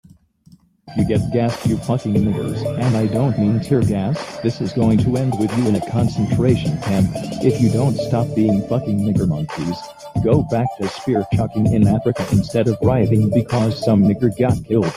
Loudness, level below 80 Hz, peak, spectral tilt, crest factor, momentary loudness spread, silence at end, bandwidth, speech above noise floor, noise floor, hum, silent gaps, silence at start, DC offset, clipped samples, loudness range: -18 LUFS; -42 dBFS; -2 dBFS; -8 dB/octave; 14 dB; 6 LU; 0 s; 14.5 kHz; 33 dB; -50 dBFS; none; none; 0.85 s; under 0.1%; under 0.1%; 3 LU